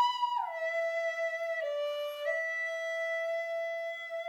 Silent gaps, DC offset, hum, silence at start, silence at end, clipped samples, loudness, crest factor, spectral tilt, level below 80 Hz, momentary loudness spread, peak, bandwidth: none; under 0.1%; none; 0 s; 0 s; under 0.1%; -33 LUFS; 14 dB; 1.5 dB/octave; under -90 dBFS; 3 LU; -18 dBFS; 16 kHz